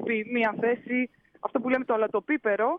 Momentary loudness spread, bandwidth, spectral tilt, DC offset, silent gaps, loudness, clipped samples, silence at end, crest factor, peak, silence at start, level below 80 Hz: 6 LU; 4.7 kHz; -8 dB/octave; under 0.1%; none; -27 LUFS; under 0.1%; 0 s; 14 dB; -12 dBFS; 0 s; -72 dBFS